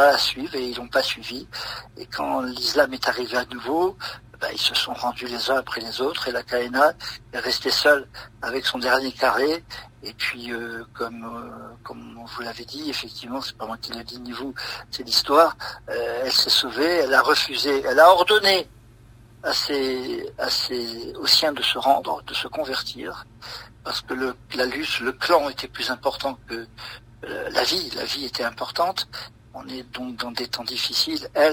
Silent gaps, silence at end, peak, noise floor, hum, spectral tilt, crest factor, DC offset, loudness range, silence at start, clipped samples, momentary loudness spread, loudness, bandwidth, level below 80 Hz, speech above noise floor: none; 0 s; -2 dBFS; -49 dBFS; none; -2 dB/octave; 22 dB; under 0.1%; 10 LU; 0 s; under 0.1%; 18 LU; -22 LUFS; 16 kHz; -54 dBFS; 25 dB